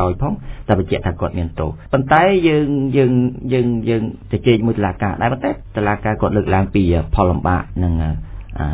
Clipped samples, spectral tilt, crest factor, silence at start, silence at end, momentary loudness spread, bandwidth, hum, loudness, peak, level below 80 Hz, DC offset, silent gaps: under 0.1%; -11.5 dB/octave; 16 dB; 0 s; 0 s; 8 LU; 4 kHz; none; -17 LUFS; 0 dBFS; -28 dBFS; under 0.1%; none